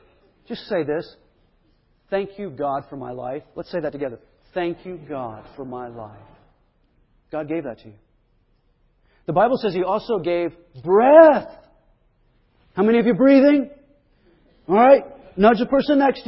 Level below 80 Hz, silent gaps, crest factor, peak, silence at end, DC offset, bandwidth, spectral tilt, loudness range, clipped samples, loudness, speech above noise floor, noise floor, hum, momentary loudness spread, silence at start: -56 dBFS; none; 20 dB; 0 dBFS; 0.05 s; under 0.1%; 5.8 kHz; -11 dB/octave; 16 LU; under 0.1%; -18 LUFS; 44 dB; -62 dBFS; none; 21 LU; 0.5 s